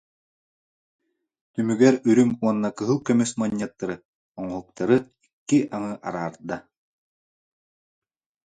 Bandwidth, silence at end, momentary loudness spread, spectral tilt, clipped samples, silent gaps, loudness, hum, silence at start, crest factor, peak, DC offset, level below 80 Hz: 9.4 kHz; 1.85 s; 16 LU; -6 dB/octave; under 0.1%; 4.05-4.35 s, 5.33-5.46 s; -23 LUFS; none; 1.55 s; 22 dB; -4 dBFS; under 0.1%; -64 dBFS